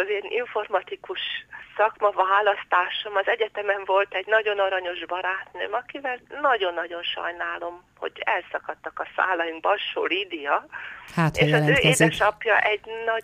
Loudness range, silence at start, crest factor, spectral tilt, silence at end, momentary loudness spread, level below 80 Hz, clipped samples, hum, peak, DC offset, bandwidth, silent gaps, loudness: 6 LU; 0 s; 20 dB; -4.5 dB/octave; 0 s; 12 LU; -56 dBFS; under 0.1%; none; -4 dBFS; under 0.1%; 15 kHz; none; -24 LUFS